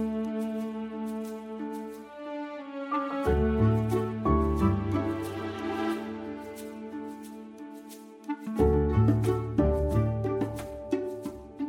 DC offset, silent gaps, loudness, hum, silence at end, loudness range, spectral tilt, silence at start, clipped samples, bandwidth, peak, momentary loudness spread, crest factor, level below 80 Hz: under 0.1%; none; -30 LUFS; none; 0 s; 7 LU; -8.5 dB/octave; 0 s; under 0.1%; 16 kHz; -12 dBFS; 16 LU; 18 dB; -38 dBFS